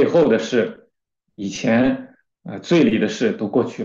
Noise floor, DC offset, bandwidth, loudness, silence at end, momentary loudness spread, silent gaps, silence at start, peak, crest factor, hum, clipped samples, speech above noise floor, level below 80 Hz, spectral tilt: -74 dBFS; under 0.1%; 7.6 kHz; -19 LUFS; 0 s; 14 LU; none; 0 s; -4 dBFS; 14 dB; none; under 0.1%; 55 dB; -56 dBFS; -6 dB/octave